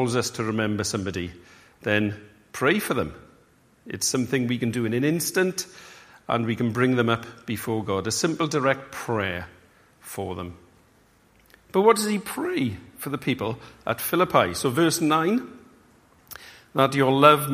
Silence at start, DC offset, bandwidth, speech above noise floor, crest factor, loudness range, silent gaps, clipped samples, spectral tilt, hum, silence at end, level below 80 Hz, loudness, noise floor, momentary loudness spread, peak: 0 s; under 0.1%; 15.5 kHz; 35 dB; 24 dB; 4 LU; none; under 0.1%; -4.5 dB/octave; none; 0 s; -58 dBFS; -24 LUFS; -59 dBFS; 16 LU; 0 dBFS